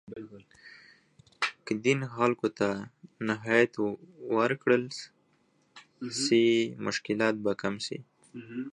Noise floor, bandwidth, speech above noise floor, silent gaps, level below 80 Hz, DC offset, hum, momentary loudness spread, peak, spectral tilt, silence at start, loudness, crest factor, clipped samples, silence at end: -69 dBFS; 11 kHz; 40 dB; none; -72 dBFS; under 0.1%; none; 18 LU; -10 dBFS; -4.5 dB/octave; 0.1 s; -29 LUFS; 22 dB; under 0.1%; 0 s